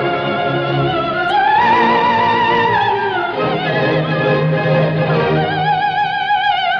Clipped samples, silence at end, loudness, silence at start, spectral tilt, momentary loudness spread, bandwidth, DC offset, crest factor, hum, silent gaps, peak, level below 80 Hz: under 0.1%; 0 s; -15 LUFS; 0 s; -7.5 dB/octave; 5 LU; 6.6 kHz; under 0.1%; 12 dB; none; none; -4 dBFS; -48 dBFS